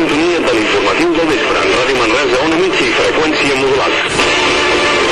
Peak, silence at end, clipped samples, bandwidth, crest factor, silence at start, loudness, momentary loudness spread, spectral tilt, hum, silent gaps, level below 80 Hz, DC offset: -2 dBFS; 0 s; under 0.1%; 12.5 kHz; 10 dB; 0 s; -11 LUFS; 1 LU; -3 dB/octave; none; none; -36 dBFS; under 0.1%